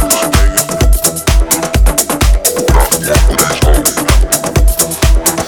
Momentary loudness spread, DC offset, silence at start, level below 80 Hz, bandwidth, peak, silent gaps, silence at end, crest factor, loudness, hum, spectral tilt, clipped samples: 2 LU; under 0.1%; 0 s; -12 dBFS; over 20 kHz; 0 dBFS; none; 0 s; 10 dB; -11 LUFS; none; -3.5 dB/octave; under 0.1%